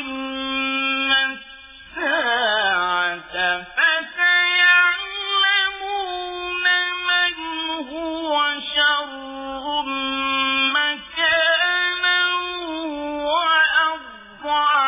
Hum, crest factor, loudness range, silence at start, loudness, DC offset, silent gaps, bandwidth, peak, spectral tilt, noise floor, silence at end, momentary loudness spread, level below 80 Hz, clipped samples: none; 16 dB; 4 LU; 0 s; -19 LUFS; under 0.1%; none; 3.9 kHz; -6 dBFS; -4.5 dB/octave; -42 dBFS; 0 s; 12 LU; -56 dBFS; under 0.1%